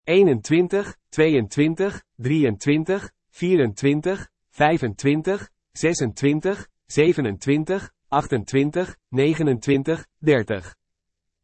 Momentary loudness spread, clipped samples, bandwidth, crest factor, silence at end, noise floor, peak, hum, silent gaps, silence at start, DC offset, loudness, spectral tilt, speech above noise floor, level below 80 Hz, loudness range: 9 LU; under 0.1%; 8.8 kHz; 18 dB; 0.75 s; -79 dBFS; -4 dBFS; none; none; 0.05 s; under 0.1%; -22 LUFS; -6 dB/octave; 59 dB; -54 dBFS; 1 LU